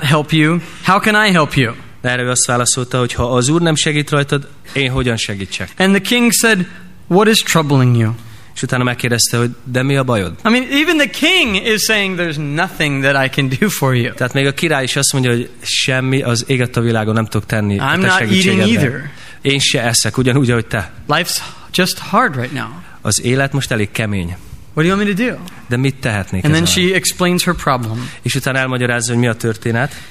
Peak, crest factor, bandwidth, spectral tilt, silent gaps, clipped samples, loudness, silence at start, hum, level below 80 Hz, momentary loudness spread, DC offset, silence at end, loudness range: 0 dBFS; 14 dB; 15.5 kHz; -4 dB/octave; none; under 0.1%; -14 LUFS; 0 s; none; -42 dBFS; 8 LU; 1%; 0 s; 3 LU